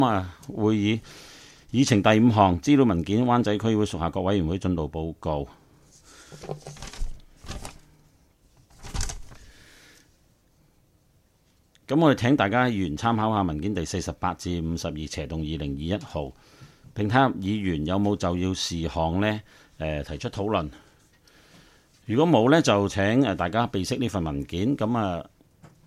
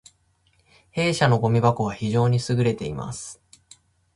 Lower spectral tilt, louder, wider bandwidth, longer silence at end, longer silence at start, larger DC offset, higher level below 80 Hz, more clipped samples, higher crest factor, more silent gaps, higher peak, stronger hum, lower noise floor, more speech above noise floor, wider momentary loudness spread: about the same, -6 dB/octave vs -6 dB/octave; about the same, -25 LUFS vs -23 LUFS; first, 14 kHz vs 11.5 kHz; second, 0.2 s vs 0.85 s; second, 0 s vs 0.95 s; neither; first, -44 dBFS vs -52 dBFS; neither; about the same, 22 dB vs 20 dB; neither; about the same, -4 dBFS vs -4 dBFS; neither; about the same, -63 dBFS vs -64 dBFS; second, 39 dB vs 43 dB; first, 19 LU vs 14 LU